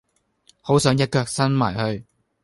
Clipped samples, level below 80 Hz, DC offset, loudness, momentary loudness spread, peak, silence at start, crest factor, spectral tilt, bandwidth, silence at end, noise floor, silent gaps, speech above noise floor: under 0.1%; -52 dBFS; under 0.1%; -21 LUFS; 12 LU; -2 dBFS; 0.65 s; 20 dB; -5.5 dB/octave; 11.5 kHz; 0.4 s; -60 dBFS; none; 40 dB